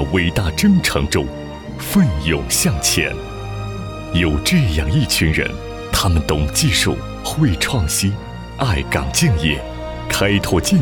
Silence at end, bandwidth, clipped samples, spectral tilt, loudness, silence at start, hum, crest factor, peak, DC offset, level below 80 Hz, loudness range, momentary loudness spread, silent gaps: 0 s; over 20 kHz; under 0.1%; -4.5 dB/octave; -17 LUFS; 0 s; none; 14 dB; -4 dBFS; under 0.1%; -28 dBFS; 2 LU; 12 LU; none